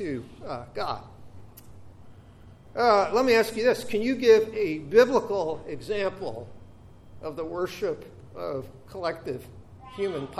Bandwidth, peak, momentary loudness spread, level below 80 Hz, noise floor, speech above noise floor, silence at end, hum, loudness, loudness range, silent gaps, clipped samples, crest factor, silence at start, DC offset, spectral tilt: 14.5 kHz; -6 dBFS; 18 LU; -56 dBFS; -49 dBFS; 24 dB; 0 s; none; -26 LUFS; 12 LU; none; under 0.1%; 20 dB; 0 s; under 0.1%; -5 dB/octave